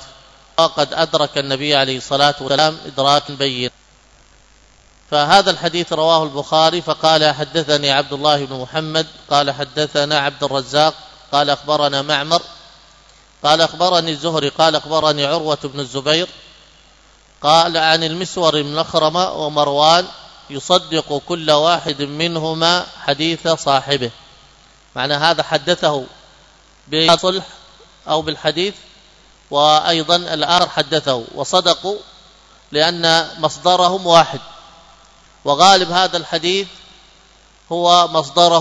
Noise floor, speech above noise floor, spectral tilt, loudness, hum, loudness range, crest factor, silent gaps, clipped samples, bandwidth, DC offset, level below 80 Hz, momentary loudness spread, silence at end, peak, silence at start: -49 dBFS; 34 dB; -3.5 dB/octave; -16 LUFS; none; 3 LU; 16 dB; none; under 0.1%; 11 kHz; under 0.1%; -54 dBFS; 9 LU; 0 s; 0 dBFS; 0 s